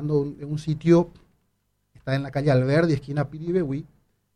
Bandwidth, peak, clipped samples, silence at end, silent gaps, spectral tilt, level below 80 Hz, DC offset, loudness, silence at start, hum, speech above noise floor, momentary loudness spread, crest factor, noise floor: 10 kHz; -6 dBFS; under 0.1%; 0.5 s; none; -8 dB/octave; -52 dBFS; under 0.1%; -24 LUFS; 0 s; none; 49 dB; 11 LU; 18 dB; -72 dBFS